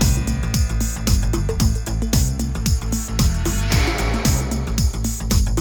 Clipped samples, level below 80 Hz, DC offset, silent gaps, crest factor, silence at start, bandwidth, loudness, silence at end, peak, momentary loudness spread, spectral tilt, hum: under 0.1%; -22 dBFS; under 0.1%; none; 14 dB; 0 s; over 20 kHz; -21 LUFS; 0 s; -4 dBFS; 3 LU; -4.5 dB/octave; none